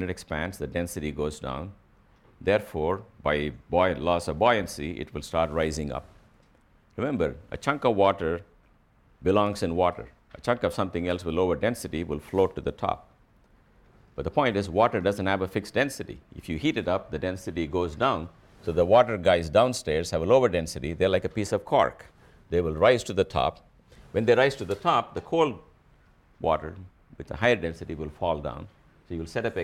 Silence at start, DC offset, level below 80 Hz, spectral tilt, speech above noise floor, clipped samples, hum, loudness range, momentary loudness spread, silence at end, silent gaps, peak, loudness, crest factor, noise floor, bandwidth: 0 s; under 0.1%; -48 dBFS; -5.5 dB/octave; 35 dB; under 0.1%; none; 6 LU; 14 LU; 0 s; none; -6 dBFS; -27 LUFS; 20 dB; -61 dBFS; 15.5 kHz